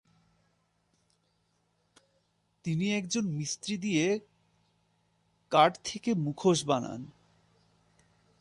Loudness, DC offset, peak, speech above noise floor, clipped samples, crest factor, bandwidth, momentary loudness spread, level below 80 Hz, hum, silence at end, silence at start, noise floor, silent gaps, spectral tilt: -30 LUFS; under 0.1%; -8 dBFS; 45 dB; under 0.1%; 24 dB; 11.5 kHz; 12 LU; -70 dBFS; none; 1.35 s; 2.65 s; -74 dBFS; none; -4.5 dB/octave